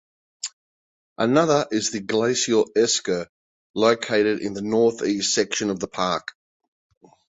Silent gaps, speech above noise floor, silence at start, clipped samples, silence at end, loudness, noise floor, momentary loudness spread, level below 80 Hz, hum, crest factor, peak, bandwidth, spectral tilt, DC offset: 0.53-1.16 s, 3.29-3.74 s; over 69 dB; 0.45 s; under 0.1%; 1.1 s; -22 LUFS; under -90 dBFS; 14 LU; -62 dBFS; none; 18 dB; -4 dBFS; 8.4 kHz; -3.5 dB/octave; under 0.1%